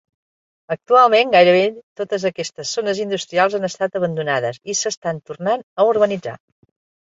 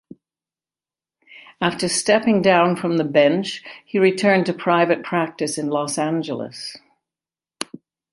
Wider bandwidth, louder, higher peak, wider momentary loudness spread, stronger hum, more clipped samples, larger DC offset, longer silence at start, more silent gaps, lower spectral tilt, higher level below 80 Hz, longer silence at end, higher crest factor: second, 8 kHz vs 11.5 kHz; about the same, -18 LUFS vs -19 LUFS; about the same, -2 dBFS vs -2 dBFS; about the same, 14 LU vs 16 LU; neither; neither; neither; second, 0.7 s vs 1.3 s; first, 1.83-1.96 s, 4.97-5.02 s, 5.63-5.76 s vs none; about the same, -3.5 dB/octave vs -4.5 dB/octave; about the same, -66 dBFS vs -66 dBFS; first, 0.7 s vs 0.5 s; about the same, 18 dB vs 18 dB